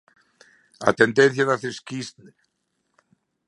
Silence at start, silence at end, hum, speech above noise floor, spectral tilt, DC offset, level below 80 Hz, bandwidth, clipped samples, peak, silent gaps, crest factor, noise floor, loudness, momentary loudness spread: 0.8 s; 1.4 s; none; 53 dB; -5 dB/octave; under 0.1%; -68 dBFS; 11.5 kHz; under 0.1%; 0 dBFS; none; 24 dB; -74 dBFS; -21 LUFS; 16 LU